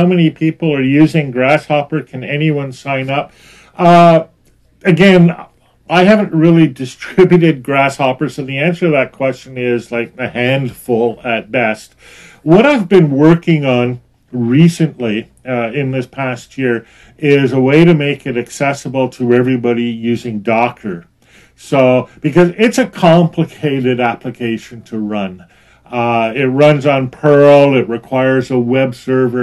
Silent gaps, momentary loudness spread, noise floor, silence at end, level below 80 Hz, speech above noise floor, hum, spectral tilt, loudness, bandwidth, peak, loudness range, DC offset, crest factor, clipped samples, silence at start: none; 12 LU; -51 dBFS; 0 s; -50 dBFS; 39 dB; none; -7 dB/octave; -12 LUFS; 12.5 kHz; 0 dBFS; 5 LU; under 0.1%; 12 dB; 0.2%; 0 s